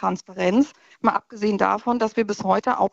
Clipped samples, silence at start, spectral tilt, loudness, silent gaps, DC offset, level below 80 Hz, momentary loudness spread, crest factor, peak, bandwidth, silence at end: under 0.1%; 0 s; -6 dB/octave; -22 LUFS; none; under 0.1%; -60 dBFS; 5 LU; 20 dB; -2 dBFS; 8 kHz; 0.05 s